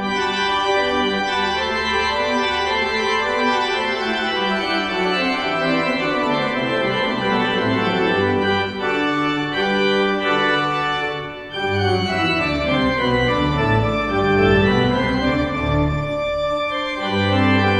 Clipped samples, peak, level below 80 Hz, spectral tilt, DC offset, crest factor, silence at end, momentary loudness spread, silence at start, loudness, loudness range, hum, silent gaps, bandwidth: under 0.1%; -4 dBFS; -38 dBFS; -5.5 dB/octave; under 0.1%; 16 dB; 0 s; 4 LU; 0 s; -19 LUFS; 2 LU; none; none; 10 kHz